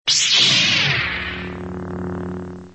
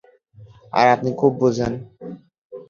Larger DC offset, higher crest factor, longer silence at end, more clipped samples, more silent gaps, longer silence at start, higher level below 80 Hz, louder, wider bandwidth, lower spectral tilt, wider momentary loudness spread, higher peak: first, 0.2% vs under 0.1%; about the same, 18 dB vs 20 dB; about the same, 0 s vs 0.1 s; neither; second, none vs 2.38-2.50 s; second, 0.05 s vs 0.4 s; first, -44 dBFS vs -52 dBFS; first, -15 LUFS vs -19 LUFS; first, 8.8 kHz vs 7.4 kHz; second, -1.5 dB/octave vs -6.5 dB/octave; second, 18 LU vs 21 LU; about the same, -2 dBFS vs -2 dBFS